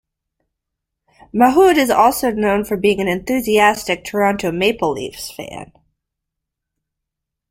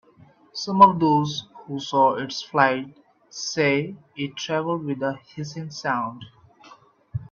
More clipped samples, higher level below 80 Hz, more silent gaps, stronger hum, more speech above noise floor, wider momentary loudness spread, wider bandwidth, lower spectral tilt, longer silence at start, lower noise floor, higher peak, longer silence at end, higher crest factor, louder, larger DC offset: neither; first, -48 dBFS vs -62 dBFS; neither; neither; first, 65 dB vs 31 dB; second, 16 LU vs 19 LU; first, 16.5 kHz vs 7.4 kHz; about the same, -4.5 dB/octave vs -5 dB/octave; first, 1.35 s vs 0.55 s; first, -81 dBFS vs -54 dBFS; about the same, 0 dBFS vs 0 dBFS; first, 1.85 s vs 0.05 s; second, 18 dB vs 24 dB; first, -16 LUFS vs -23 LUFS; neither